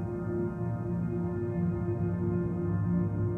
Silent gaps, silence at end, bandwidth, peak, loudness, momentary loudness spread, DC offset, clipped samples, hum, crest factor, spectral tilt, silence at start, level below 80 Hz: none; 0 s; 2.6 kHz; -20 dBFS; -32 LUFS; 3 LU; under 0.1%; under 0.1%; none; 12 dB; -12 dB/octave; 0 s; -48 dBFS